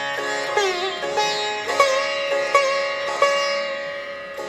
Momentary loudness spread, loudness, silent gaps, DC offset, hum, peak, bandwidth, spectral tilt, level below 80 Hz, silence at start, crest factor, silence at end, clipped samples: 8 LU; -21 LUFS; none; under 0.1%; none; -2 dBFS; 14.5 kHz; -1 dB/octave; -64 dBFS; 0 s; 20 dB; 0 s; under 0.1%